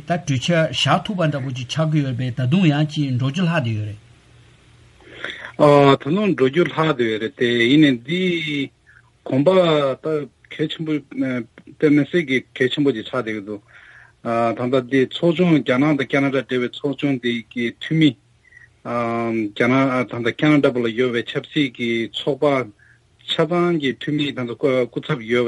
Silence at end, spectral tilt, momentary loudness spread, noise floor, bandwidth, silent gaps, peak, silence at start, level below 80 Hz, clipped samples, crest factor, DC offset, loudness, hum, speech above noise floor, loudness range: 0 s; -6.5 dB/octave; 10 LU; -53 dBFS; 11.5 kHz; none; -2 dBFS; 0.05 s; -60 dBFS; under 0.1%; 18 dB; under 0.1%; -19 LUFS; none; 34 dB; 4 LU